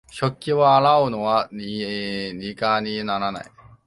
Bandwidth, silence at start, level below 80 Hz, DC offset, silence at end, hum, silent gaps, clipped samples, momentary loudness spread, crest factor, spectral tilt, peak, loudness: 11.5 kHz; 0.1 s; -56 dBFS; under 0.1%; 0.4 s; none; none; under 0.1%; 13 LU; 16 dB; -6 dB/octave; -4 dBFS; -21 LUFS